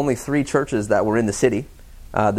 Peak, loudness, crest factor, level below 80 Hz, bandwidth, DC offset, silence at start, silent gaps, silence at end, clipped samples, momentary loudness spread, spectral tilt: -4 dBFS; -21 LUFS; 18 dB; -42 dBFS; 15.5 kHz; under 0.1%; 0 s; none; 0 s; under 0.1%; 9 LU; -6 dB/octave